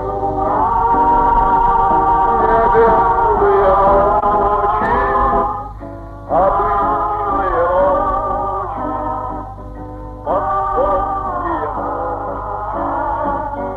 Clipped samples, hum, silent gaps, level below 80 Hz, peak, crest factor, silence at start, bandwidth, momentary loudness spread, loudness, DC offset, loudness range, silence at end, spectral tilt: under 0.1%; none; none; -30 dBFS; -2 dBFS; 12 dB; 0 s; 5.2 kHz; 12 LU; -15 LUFS; under 0.1%; 7 LU; 0 s; -8.5 dB/octave